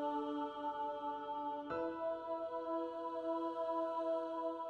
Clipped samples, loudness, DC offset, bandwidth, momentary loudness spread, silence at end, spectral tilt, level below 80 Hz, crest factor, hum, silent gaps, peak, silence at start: under 0.1%; -41 LUFS; under 0.1%; 8 kHz; 4 LU; 0 s; -6.5 dB/octave; -78 dBFS; 12 dB; none; none; -30 dBFS; 0 s